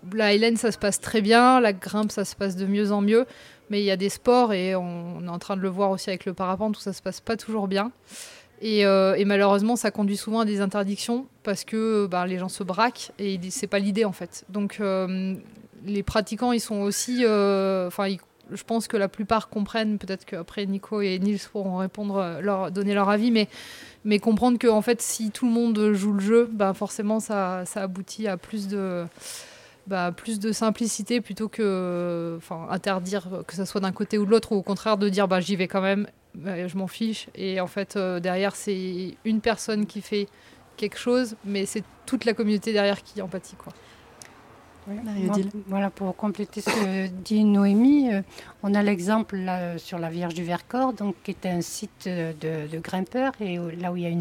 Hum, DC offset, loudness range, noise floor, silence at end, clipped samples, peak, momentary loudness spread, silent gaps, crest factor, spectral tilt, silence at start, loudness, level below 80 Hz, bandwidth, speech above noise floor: none; under 0.1%; 6 LU; -50 dBFS; 0 s; under 0.1%; -4 dBFS; 12 LU; none; 22 dB; -5 dB/octave; 0.05 s; -25 LUFS; -58 dBFS; 16 kHz; 26 dB